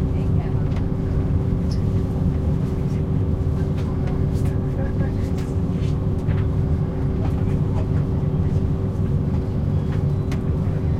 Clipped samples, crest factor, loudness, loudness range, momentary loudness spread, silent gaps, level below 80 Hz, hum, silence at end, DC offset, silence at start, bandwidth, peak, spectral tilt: under 0.1%; 12 dB; -22 LUFS; 1 LU; 2 LU; none; -28 dBFS; none; 0 s; under 0.1%; 0 s; 8.4 kHz; -8 dBFS; -9.5 dB/octave